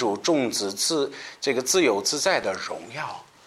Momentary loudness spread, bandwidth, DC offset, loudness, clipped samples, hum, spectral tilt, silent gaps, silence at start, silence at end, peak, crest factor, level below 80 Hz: 12 LU; 16 kHz; under 0.1%; -24 LUFS; under 0.1%; none; -2 dB/octave; none; 0 s; 0.25 s; -8 dBFS; 18 dB; -68 dBFS